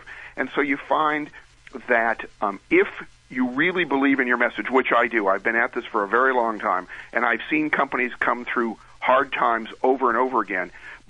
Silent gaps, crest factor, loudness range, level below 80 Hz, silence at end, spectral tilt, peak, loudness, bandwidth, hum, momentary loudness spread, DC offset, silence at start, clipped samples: none; 20 dB; 3 LU; -58 dBFS; 0.15 s; -6 dB/octave; -4 dBFS; -22 LUFS; 9.8 kHz; none; 9 LU; under 0.1%; 0 s; under 0.1%